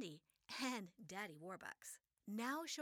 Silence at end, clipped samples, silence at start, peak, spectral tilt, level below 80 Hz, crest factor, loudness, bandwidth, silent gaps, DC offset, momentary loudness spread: 0 s; under 0.1%; 0 s; -32 dBFS; -3 dB/octave; under -90 dBFS; 18 dB; -49 LUFS; over 20 kHz; none; under 0.1%; 12 LU